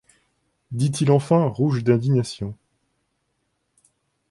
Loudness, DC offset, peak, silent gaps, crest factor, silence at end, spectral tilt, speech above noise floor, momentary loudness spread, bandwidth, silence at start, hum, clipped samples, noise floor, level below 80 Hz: -21 LUFS; under 0.1%; -4 dBFS; none; 18 dB; 1.75 s; -7.5 dB/octave; 53 dB; 15 LU; 11.5 kHz; 0.7 s; none; under 0.1%; -73 dBFS; -56 dBFS